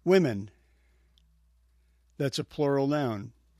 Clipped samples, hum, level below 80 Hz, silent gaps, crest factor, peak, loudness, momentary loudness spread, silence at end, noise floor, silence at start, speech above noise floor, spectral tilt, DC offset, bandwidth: under 0.1%; none; -64 dBFS; none; 20 dB; -10 dBFS; -29 LUFS; 14 LU; 0.3 s; -65 dBFS; 0.05 s; 38 dB; -6.5 dB/octave; under 0.1%; 14 kHz